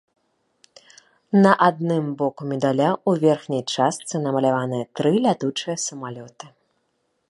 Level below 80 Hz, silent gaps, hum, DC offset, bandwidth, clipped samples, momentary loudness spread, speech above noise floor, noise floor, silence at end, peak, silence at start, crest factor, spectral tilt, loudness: -70 dBFS; none; none; under 0.1%; 11.5 kHz; under 0.1%; 10 LU; 50 dB; -71 dBFS; 0.8 s; -2 dBFS; 1.3 s; 20 dB; -5.5 dB/octave; -21 LUFS